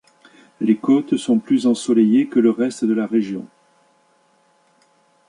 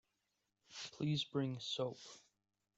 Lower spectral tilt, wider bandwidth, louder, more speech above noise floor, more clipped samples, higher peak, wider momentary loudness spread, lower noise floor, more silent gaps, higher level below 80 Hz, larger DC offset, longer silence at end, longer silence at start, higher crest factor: about the same, -6 dB/octave vs -5.5 dB/octave; first, 11 kHz vs 8 kHz; first, -18 LUFS vs -42 LUFS; about the same, 42 dB vs 45 dB; neither; first, -4 dBFS vs -26 dBFS; second, 6 LU vs 17 LU; second, -59 dBFS vs -87 dBFS; neither; first, -68 dBFS vs -80 dBFS; neither; first, 1.85 s vs 0.6 s; about the same, 0.6 s vs 0.7 s; about the same, 16 dB vs 18 dB